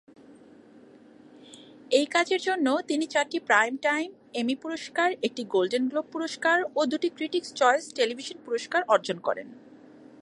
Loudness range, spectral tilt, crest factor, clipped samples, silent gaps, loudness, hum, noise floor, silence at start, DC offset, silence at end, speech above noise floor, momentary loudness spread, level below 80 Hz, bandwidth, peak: 2 LU; -3 dB/octave; 20 dB; under 0.1%; none; -26 LUFS; none; -52 dBFS; 0.3 s; under 0.1%; 0.65 s; 26 dB; 9 LU; -82 dBFS; 11.5 kHz; -6 dBFS